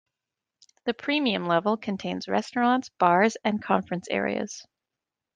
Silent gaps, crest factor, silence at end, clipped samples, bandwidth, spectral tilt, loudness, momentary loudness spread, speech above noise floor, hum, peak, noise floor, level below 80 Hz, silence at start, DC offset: none; 22 dB; 0.75 s; under 0.1%; 9.6 kHz; -5 dB/octave; -26 LUFS; 10 LU; 62 dB; none; -4 dBFS; -88 dBFS; -70 dBFS; 0.85 s; under 0.1%